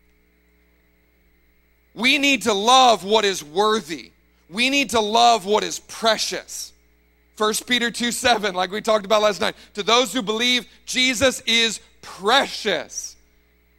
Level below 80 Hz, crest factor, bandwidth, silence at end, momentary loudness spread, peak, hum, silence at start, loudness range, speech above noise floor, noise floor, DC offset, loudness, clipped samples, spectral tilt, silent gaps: -56 dBFS; 20 dB; 16.5 kHz; 0.65 s; 14 LU; -2 dBFS; none; 1.95 s; 3 LU; 40 dB; -60 dBFS; under 0.1%; -19 LUFS; under 0.1%; -2 dB/octave; none